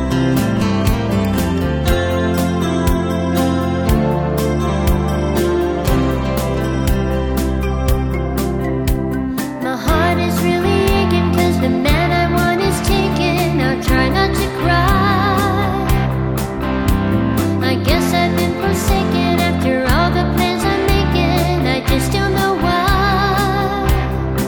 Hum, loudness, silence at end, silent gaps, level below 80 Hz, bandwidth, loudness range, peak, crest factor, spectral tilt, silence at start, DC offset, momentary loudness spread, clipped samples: none; -16 LUFS; 0 s; none; -24 dBFS; 19.5 kHz; 3 LU; 0 dBFS; 14 dB; -6 dB/octave; 0 s; under 0.1%; 4 LU; under 0.1%